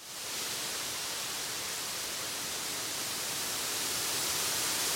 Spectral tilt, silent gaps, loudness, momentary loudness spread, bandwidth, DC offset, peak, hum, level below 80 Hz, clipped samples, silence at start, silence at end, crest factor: 0 dB/octave; none; -32 LUFS; 5 LU; 16.5 kHz; under 0.1%; -20 dBFS; none; -66 dBFS; under 0.1%; 0 s; 0 s; 16 dB